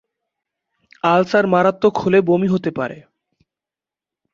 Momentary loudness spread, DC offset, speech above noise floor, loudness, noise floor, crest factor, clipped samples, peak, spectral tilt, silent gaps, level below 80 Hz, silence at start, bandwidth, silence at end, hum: 9 LU; under 0.1%; 73 dB; -17 LUFS; -89 dBFS; 18 dB; under 0.1%; -2 dBFS; -7.5 dB/octave; none; -58 dBFS; 1.05 s; 7.4 kHz; 1.35 s; none